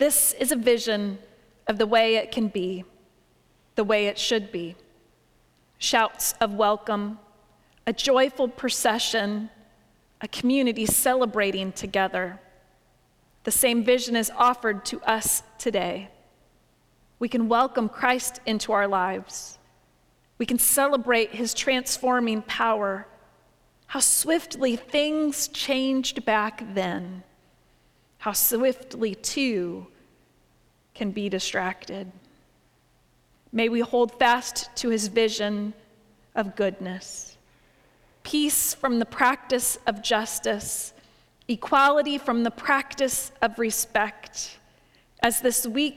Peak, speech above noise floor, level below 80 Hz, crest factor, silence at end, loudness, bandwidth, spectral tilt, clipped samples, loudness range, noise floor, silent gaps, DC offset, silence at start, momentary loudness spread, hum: -4 dBFS; 38 dB; -58 dBFS; 22 dB; 0 s; -24 LUFS; 19.5 kHz; -2.5 dB/octave; under 0.1%; 5 LU; -63 dBFS; none; under 0.1%; 0 s; 14 LU; none